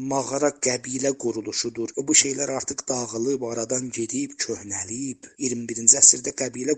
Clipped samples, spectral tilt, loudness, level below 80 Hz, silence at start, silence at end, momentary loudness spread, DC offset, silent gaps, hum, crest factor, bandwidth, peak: under 0.1%; -2 dB/octave; -22 LUFS; -66 dBFS; 0 s; 0 s; 14 LU; under 0.1%; none; none; 24 dB; 9.6 kHz; 0 dBFS